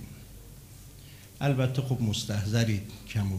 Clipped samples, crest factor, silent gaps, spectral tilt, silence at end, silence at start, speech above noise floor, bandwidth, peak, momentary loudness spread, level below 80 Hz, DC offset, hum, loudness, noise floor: under 0.1%; 18 dB; none; -6 dB/octave; 0 s; 0 s; 20 dB; 16 kHz; -12 dBFS; 21 LU; -52 dBFS; under 0.1%; none; -29 LUFS; -48 dBFS